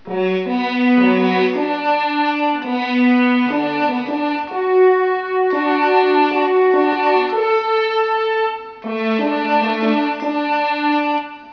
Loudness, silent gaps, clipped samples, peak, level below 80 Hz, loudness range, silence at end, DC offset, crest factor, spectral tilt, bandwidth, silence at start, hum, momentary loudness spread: -17 LUFS; none; under 0.1%; -4 dBFS; -66 dBFS; 3 LU; 0 s; under 0.1%; 14 dB; -6.5 dB/octave; 5.4 kHz; 0.05 s; none; 7 LU